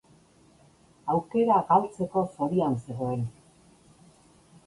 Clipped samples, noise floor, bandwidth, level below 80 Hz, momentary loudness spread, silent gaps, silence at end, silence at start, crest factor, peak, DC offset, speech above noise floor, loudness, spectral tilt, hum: under 0.1%; -59 dBFS; 11.5 kHz; -62 dBFS; 10 LU; none; 1.35 s; 1.05 s; 20 dB; -8 dBFS; under 0.1%; 33 dB; -27 LUFS; -8.5 dB/octave; none